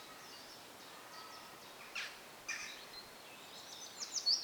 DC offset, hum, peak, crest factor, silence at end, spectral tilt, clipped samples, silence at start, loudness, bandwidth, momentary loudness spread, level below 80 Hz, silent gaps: under 0.1%; none; -20 dBFS; 26 dB; 0 s; 1 dB/octave; under 0.1%; 0 s; -45 LUFS; over 20 kHz; 11 LU; -82 dBFS; none